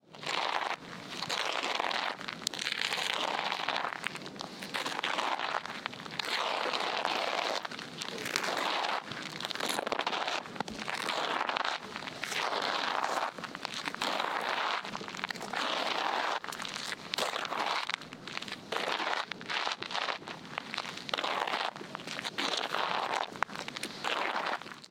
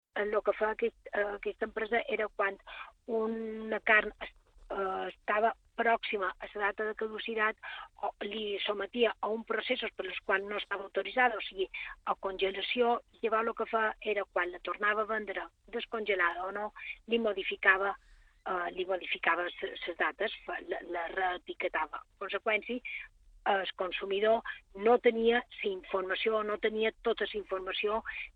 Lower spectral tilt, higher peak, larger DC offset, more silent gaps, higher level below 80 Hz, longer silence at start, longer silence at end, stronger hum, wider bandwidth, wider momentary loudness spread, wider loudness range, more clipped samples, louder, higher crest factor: second, -1.5 dB/octave vs -5.5 dB/octave; first, -4 dBFS vs -10 dBFS; neither; neither; second, -74 dBFS vs -64 dBFS; about the same, 0.1 s vs 0.15 s; about the same, 0.05 s vs 0.05 s; neither; first, 16.5 kHz vs 4.8 kHz; about the same, 8 LU vs 10 LU; about the same, 2 LU vs 4 LU; neither; about the same, -34 LUFS vs -33 LUFS; first, 30 dB vs 22 dB